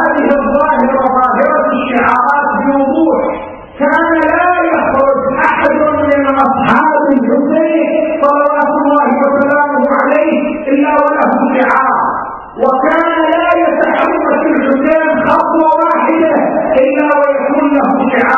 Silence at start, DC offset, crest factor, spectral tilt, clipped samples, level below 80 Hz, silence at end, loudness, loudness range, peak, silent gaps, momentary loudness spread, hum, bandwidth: 0 s; under 0.1%; 10 dB; -7.5 dB/octave; under 0.1%; -44 dBFS; 0 s; -10 LUFS; 1 LU; 0 dBFS; none; 2 LU; none; 6 kHz